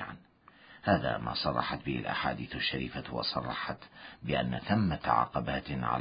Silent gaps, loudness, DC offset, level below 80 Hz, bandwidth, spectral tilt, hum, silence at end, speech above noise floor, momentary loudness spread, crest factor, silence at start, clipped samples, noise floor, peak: none; -32 LUFS; under 0.1%; -52 dBFS; 5.2 kHz; -9.5 dB/octave; none; 0 s; 27 dB; 10 LU; 22 dB; 0 s; under 0.1%; -59 dBFS; -12 dBFS